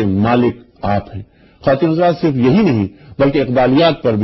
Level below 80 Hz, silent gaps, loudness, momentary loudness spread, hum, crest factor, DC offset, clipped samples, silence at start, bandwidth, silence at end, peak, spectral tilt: -40 dBFS; none; -14 LUFS; 10 LU; none; 14 dB; under 0.1%; under 0.1%; 0 s; 6 kHz; 0 s; 0 dBFS; -9 dB/octave